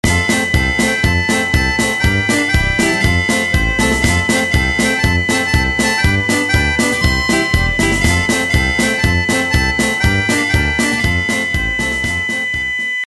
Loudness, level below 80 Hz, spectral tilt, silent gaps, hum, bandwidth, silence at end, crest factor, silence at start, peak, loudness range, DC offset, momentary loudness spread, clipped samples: -14 LUFS; -24 dBFS; -4 dB/octave; none; none; 13 kHz; 0 s; 14 dB; 0.05 s; 0 dBFS; 1 LU; under 0.1%; 3 LU; under 0.1%